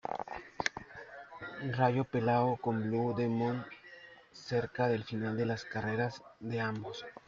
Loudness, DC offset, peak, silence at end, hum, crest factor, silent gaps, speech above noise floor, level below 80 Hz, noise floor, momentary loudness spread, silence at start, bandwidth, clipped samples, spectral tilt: -34 LUFS; under 0.1%; -10 dBFS; 0.1 s; none; 24 dB; none; 22 dB; -68 dBFS; -55 dBFS; 18 LU; 0.05 s; 7.6 kHz; under 0.1%; -7 dB/octave